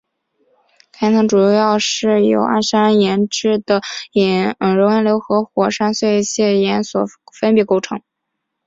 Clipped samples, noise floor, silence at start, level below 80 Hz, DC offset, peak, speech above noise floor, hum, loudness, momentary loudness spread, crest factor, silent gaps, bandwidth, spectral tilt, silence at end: under 0.1%; -76 dBFS; 1 s; -58 dBFS; under 0.1%; -2 dBFS; 61 dB; none; -15 LUFS; 7 LU; 14 dB; none; 7.8 kHz; -5 dB/octave; 0.7 s